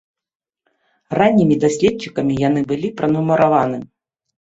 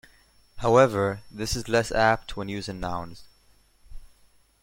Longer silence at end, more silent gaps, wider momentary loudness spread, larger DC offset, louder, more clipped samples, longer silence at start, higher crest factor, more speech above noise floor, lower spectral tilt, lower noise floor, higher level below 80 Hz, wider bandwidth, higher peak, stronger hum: about the same, 0.65 s vs 0.55 s; neither; second, 8 LU vs 14 LU; neither; first, -17 LUFS vs -25 LUFS; neither; first, 1.1 s vs 0.55 s; second, 16 dB vs 22 dB; first, 72 dB vs 36 dB; first, -7 dB/octave vs -5 dB/octave; first, -88 dBFS vs -60 dBFS; second, -52 dBFS vs -44 dBFS; second, 8.2 kHz vs 16.5 kHz; first, -2 dBFS vs -6 dBFS; neither